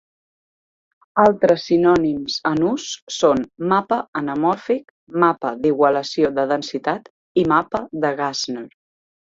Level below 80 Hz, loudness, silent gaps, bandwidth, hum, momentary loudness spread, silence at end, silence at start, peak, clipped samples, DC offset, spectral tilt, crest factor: -56 dBFS; -19 LUFS; 3.02-3.07 s, 4.08-4.13 s, 4.90-5.07 s, 7.10-7.35 s; 7.8 kHz; none; 9 LU; 0.7 s; 1.15 s; -2 dBFS; under 0.1%; under 0.1%; -5 dB/octave; 18 dB